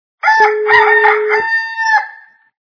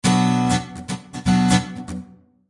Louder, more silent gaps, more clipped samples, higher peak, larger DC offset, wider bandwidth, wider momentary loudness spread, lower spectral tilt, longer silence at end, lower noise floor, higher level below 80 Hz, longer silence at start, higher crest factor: first, -11 LUFS vs -20 LUFS; neither; first, 0.1% vs under 0.1%; first, 0 dBFS vs -4 dBFS; neither; second, 5.4 kHz vs 11.5 kHz; second, 7 LU vs 15 LU; second, -1.5 dB/octave vs -5 dB/octave; about the same, 0.45 s vs 0.45 s; second, -39 dBFS vs -43 dBFS; second, -56 dBFS vs -44 dBFS; first, 0.25 s vs 0.05 s; second, 12 dB vs 18 dB